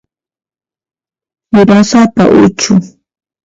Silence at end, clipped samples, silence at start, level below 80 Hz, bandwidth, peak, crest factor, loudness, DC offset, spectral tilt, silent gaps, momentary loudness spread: 0.55 s; 0.3%; 1.55 s; -44 dBFS; 7.8 kHz; 0 dBFS; 10 dB; -8 LUFS; under 0.1%; -5.5 dB/octave; none; 6 LU